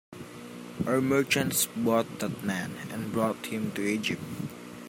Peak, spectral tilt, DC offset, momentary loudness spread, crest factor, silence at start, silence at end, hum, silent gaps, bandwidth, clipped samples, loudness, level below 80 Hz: -12 dBFS; -4 dB/octave; under 0.1%; 16 LU; 18 dB; 0.1 s; 0 s; none; none; 16.5 kHz; under 0.1%; -29 LUFS; -64 dBFS